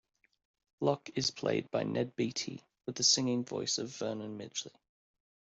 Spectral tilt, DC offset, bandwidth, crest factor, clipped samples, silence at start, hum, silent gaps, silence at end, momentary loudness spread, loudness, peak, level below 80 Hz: -3 dB/octave; under 0.1%; 8.2 kHz; 22 dB; under 0.1%; 0.8 s; none; none; 0.9 s; 14 LU; -33 LUFS; -14 dBFS; -74 dBFS